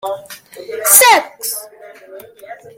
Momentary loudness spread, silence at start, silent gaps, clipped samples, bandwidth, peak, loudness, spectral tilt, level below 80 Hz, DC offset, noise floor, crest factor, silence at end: 22 LU; 0.05 s; none; 0.2%; over 20 kHz; 0 dBFS; -10 LUFS; 1.5 dB/octave; -64 dBFS; under 0.1%; -38 dBFS; 16 dB; 0.25 s